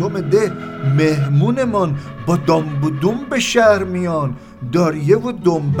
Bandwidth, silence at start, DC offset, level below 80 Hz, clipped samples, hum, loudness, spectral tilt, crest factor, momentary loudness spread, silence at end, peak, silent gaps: 16 kHz; 0 s; under 0.1%; -48 dBFS; under 0.1%; none; -17 LUFS; -6.5 dB/octave; 16 dB; 8 LU; 0 s; 0 dBFS; none